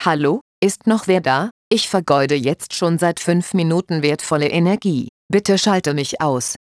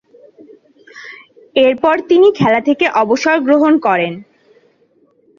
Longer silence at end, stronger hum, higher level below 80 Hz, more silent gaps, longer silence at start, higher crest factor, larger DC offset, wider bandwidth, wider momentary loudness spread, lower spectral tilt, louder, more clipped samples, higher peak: second, 0.2 s vs 1.15 s; neither; about the same, -60 dBFS vs -58 dBFS; first, 0.41-0.62 s, 1.51-1.71 s, 5.09-5.29 s vs none; second, 0 s vs 0.95 s; about the same, 16 dB vs 14 dB; neither; first, 11 kHz vs 7.2 kHz; second, 5 LU vs 22 LU; about the same, -5 dB/octave vs -5.5 dB/octave; second, -18 LUFS vs -12 LUFS; neither; about the same, -2 dBFS vs 0 dBFS